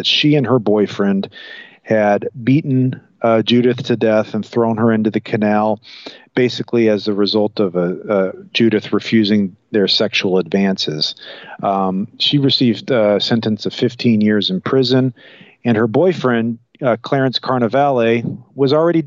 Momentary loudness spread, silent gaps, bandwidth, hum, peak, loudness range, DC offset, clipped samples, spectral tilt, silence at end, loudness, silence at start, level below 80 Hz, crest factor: 7 LU; none; 7.4 kHz; none; -4 dBFS; 1 LU; under 0.1%; under 0.1%; -6.5 dB/octave; 0 s; -16 LUFS; 0 s; -64 dBFS; 12 dB